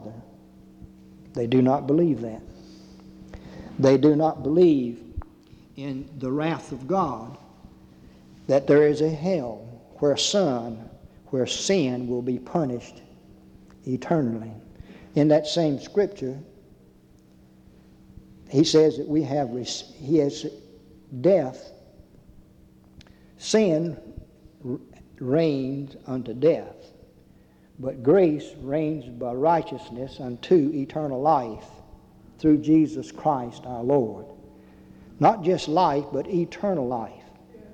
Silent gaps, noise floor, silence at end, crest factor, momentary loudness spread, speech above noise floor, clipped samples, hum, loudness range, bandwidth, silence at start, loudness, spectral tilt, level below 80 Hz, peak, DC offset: none; -55 dBFS; 0 s; 18 dB; 20 LU; 32 dB; under 0.1%; none; 5 LU; 9.4 kHz; 0 s; -24 LUFS; -6 dB/octave; -54 dBFS; -6 dBFS; under 0.1%